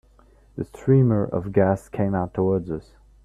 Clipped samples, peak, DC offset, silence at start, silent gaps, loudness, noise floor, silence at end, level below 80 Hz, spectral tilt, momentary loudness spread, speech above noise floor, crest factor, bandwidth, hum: under 0.1%; -4 dBFS; under 0.1%; 0.55 s; none; -22 LUFS; -54 dBFS; 0.45 s; -50 dBFS; -10.5 dB/octave; 16 LU; 32 dB; 18 dB; 10.5 kHz; none